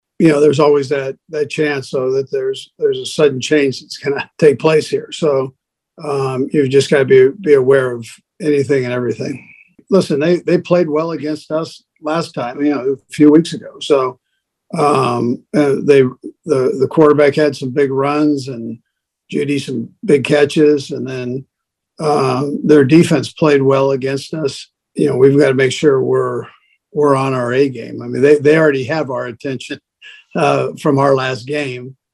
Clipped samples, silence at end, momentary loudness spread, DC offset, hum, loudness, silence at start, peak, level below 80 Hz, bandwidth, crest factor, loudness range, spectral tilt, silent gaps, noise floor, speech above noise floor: under 0.1%; 0.2 s; 13 LU; under 0.1%; none; -14 LUFS; 0.2 s; 0 dBFS; -60 dBFS; 12 kHz; 14 dB; 3 LU; -6.5 dB/octave; none; -54 dBFS; 41 dB